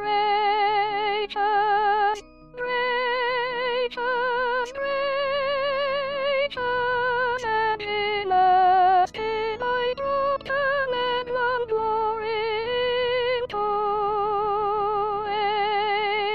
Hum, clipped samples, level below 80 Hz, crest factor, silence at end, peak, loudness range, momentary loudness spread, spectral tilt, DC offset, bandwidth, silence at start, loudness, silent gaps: none; under 0.1%; -56 dBFS; 14 dB; 0 s; -10 dBFS; 3 LU; 5 LU; -4 dB/octave; 0.3%; 8 kHz; 0 s; -24 LUFS; none